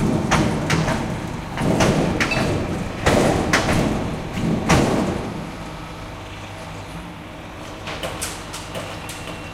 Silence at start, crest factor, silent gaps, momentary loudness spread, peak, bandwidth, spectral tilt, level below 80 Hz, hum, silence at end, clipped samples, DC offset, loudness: 0 s; 20 dB; none; 16 LU; -2 dBFS; 16.5 kHz; -5 dB/octave; -36 dBFS; none; 0 s; under 0.1%; under 0.1%; -21 LUFS